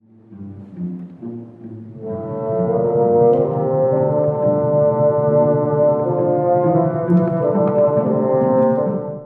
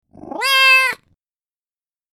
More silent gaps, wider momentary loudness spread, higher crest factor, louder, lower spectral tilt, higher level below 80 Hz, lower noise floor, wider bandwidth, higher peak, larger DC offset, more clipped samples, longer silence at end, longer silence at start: neither; second, 17 LU vs 22 LU; about the same, 14 dB vs 16 dB; second, -17 LUFS vs -12 LUFS; first, -13 dB/octave vs 1 dB/octave; about the same, -62 dBFS vs -64 dBFS; second, -37 dBFS vs under -90 dBFS; second, 3.1 kHz vs 19 kHz; about the same, -2 dBFS vs -2 dBFS; neither; neither; second, 0 s vs 1.2 s; about the same, 0.3 s vs 0.25 s